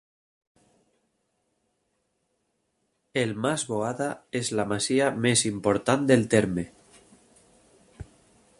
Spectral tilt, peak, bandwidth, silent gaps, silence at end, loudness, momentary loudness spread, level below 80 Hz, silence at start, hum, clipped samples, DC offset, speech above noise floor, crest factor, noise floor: -4.5 dB/octave; -4 dBFS; 11.5 kHz; none; 0.55 s; -25 LUFS; 10 LU; -58 dBFS; 3.15 s; none; under 0.1%; under 0.1%; 50 dB; 24 dB; -75 dBFS